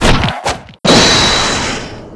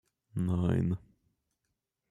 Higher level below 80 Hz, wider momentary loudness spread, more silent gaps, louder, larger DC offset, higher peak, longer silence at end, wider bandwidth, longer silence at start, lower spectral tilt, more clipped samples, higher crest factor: first, -22 dBFS vs -58 dBFS; first, 13 LU vs 10 LU; neither; first, -10 LUFS vs -33 LUFS; neither; first, 0 dBFS vs -16 dBFS; second, 0 s vs 1.1 s; about the same, 11 kHz vs 11.5 kHz; second, 0 s vs 0.35 s; second, -3 dB/octave vs -9 dB/octave; first, 0.3% vs under 0.1%; second, 12 dB vs 18 dB